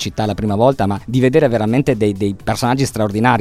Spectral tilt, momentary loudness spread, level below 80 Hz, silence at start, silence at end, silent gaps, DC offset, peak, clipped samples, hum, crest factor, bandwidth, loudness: -6.5 dB/octave; 6 LU; -40 dBFS; 0 s; 0 s; none; under 0.1%; 0 dBFS; under 0.1%; none; 16 dB; 15.5 kHz; -16 LUFS